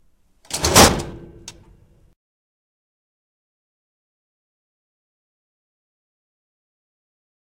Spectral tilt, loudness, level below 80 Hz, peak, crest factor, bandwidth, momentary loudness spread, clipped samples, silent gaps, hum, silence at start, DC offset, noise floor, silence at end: -3 dB/octave; -14 LUFS; -40 dBFS; 0 dBFS; 26 dB; 16 kHz; 23 LU; under 0.1%; none; none; 0.5 s; under 0.1%; -55 dBFS; 6.05 s